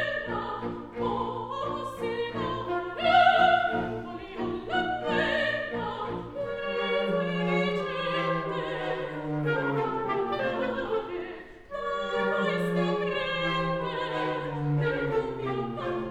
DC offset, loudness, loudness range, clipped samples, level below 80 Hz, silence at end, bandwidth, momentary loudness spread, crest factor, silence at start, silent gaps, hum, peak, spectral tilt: under 0.1%; -29 LUFS; 4 LU; under 0.1%; -54 dBFS; 0 s; 12.5 kHz; 9 LU; 20 dB; 0 s; none; none; -8 dBFS; -6.5 dB/octave